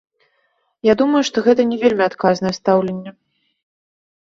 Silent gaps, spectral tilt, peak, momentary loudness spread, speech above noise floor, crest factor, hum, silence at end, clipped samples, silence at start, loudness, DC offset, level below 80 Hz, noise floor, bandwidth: none; -5.5 dB/octave; -2 dBFS; 8 LU; 50 dB; 16 dB; none; 1.25 s; under 0.1%; 0.85 s; -17 LUFS; under 0.1%; -56 dBFS; -66 dBFS; 7.8 kHz